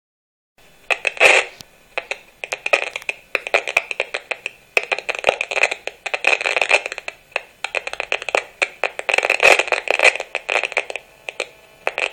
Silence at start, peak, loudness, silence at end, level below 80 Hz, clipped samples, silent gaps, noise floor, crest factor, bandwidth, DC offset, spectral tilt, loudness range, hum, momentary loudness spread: 0.9 s; 0 dBFS; -18 LUFS; 0 s; -60 dBFS; under 0.1%; none; -43 dBFS; 22 dB; 18.5 kHz; under 0.1%; 0 dB/octave; 4 LU; none; 16 LU